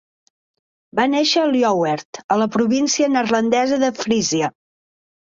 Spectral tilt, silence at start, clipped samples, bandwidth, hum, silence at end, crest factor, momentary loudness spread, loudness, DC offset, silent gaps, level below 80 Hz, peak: -3.5 dB/octave; 0.95 s; under 0.1%; 7.6 kHz; none; 0.8 s; 16 dB; 6 LU; -18 LUFS; under 0.1%; 2.05-2.13 s, 2.24-2.29 s; -60 dBFS; -4 dBFS